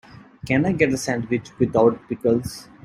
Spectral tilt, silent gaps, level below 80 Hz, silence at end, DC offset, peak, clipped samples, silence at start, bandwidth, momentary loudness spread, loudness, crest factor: -6 dB/octave; none; -50 dBFS; 0.2 s; under 0.1%; -2 dBFS; under 0.1%; 0.45 s; 16 kHz; 8 LU; -21 LUFS; 20 dB